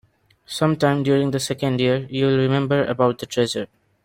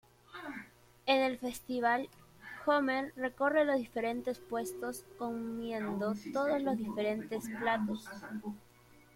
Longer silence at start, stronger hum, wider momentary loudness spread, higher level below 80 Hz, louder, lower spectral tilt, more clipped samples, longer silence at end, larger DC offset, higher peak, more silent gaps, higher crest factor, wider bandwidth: first, 0.5 s vs 0.3 s; neither; second, 5 LU vs 15 LU; first, -58 dBFS vs -70 dBFS; first, -20 LUFS vs -35 LUFS; about the same, -6 dB/octave vs -5 dB/octave; neither; second, 0.4 s vs 0.55 s; neither; first, -4 dBFS vs -16 dBFS; neither; about the same, 18 dB vs 20 dB; about the same, 16 kHz vs 16.5 kHz